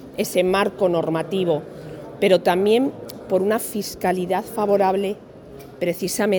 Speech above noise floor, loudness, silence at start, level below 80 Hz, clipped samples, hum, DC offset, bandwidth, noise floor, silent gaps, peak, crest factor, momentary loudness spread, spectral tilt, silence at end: 20 dB; -21 LUFS; 0 s; -56 dBFS; under 0.1%; none; under 0.1%; 19 kHz; -40 dBFS; none; -4 dBFS; 18 dB; 18 LU; -5 dB/octave; 0 s